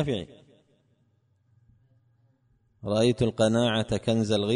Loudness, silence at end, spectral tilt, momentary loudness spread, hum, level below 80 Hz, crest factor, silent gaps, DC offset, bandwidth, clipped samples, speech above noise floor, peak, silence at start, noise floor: -25 LUFS; 0 s; -6 dB/octave; 11 LU; none; -54 dBFS; 16 dB; none; under 0.1%; 10.5 kHz; under 0.1%; 43 dB; -12 dBFS; 0 s; -68 dBFS